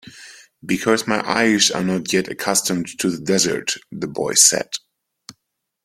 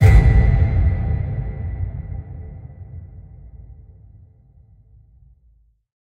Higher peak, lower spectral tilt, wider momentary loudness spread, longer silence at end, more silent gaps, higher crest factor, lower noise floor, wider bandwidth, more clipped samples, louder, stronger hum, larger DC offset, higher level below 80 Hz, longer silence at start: about the same, 0 dBFS vs -2 dBFS; second, -2.5 dB/octave vs -8.5 dB/octave; second, 15 LU vs 27 LU; second, 0.5 s vs 2.3 s; neither; about the same, 20 dB vs 18 dB; first, -75 dBFS vs -56 dBFS; first, 16.5 kHz vs 8.2 kHz; neither; about the same, -18 LUFS vs -19 LUFS; neither; neither; second, -60 dBFS vs -22 dBFS; about the same, 0.05 s vs 0 s